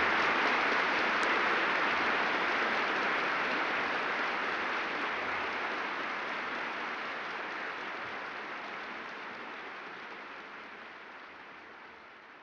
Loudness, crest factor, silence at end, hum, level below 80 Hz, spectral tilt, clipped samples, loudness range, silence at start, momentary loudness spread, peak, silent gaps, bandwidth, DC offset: -32 LUFS; 16 dB; 0 s; none; -70 dBFS; -3 dB/octave; under 0.1%; 14 LU; 0 s; 19 LU; -18 dBFS; none; 10 kHz; under 0.1%